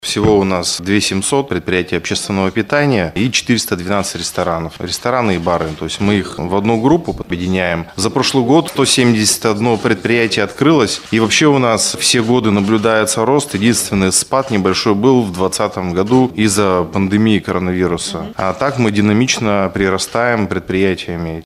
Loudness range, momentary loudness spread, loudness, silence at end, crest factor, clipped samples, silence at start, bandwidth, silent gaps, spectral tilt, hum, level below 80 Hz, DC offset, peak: 4 LU; 6 LU; -14 LUFS; 0.05 s; 14 dB; under 0.1%; 0.05 s; 15.5 kHz; none; -4.5 dB/octave; none; -42 dBFS; under 0.1%; 0 dBFS